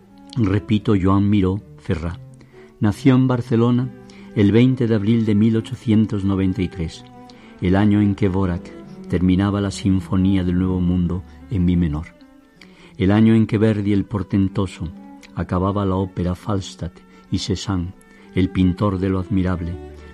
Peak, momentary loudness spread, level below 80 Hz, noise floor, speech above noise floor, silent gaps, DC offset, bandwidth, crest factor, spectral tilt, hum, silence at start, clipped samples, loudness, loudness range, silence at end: -2 dBFS; 14 LU; -40 dBFS; -47 dBFS; 29 dB; none; under 0.1%; 11 kHz; 16 dB; -8 dB/octave; none; 0.25 s; under 0.1%; -20 LUFS; 5 LU; 0 s